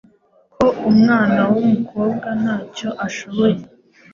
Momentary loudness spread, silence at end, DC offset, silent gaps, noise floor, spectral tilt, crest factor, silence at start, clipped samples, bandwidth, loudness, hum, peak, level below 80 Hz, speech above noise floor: 11 LU; 0.5 s; under 0.1%; none; -55 dBFS; -7 dB/octave; 14 dB; 0.6 s; under 0.1%; 7.2 kHz; -17 LUFS; none; -2 dBFS; -54 dBFS; 38 dB